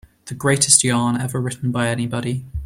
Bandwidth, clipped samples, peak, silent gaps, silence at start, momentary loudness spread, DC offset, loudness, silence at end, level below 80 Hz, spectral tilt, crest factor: 16 kHz; under 0.1%; 0 dBFS; none; 0.25 s; 12 LU; under 0.1%; -18 LUFS; 0 s; -42 dBFS; -3.5 dB/octave; 20 dB